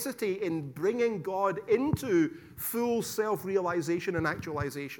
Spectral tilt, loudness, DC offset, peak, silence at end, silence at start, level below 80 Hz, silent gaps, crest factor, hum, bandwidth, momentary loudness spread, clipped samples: -5.5 dB/octave; -30 LUFS; under 0.1%; -14 dBFS; 0 s; 0 s; -58 dBFS; none; 16 dB; none; 19 kHz; 6 LU; under 0.1%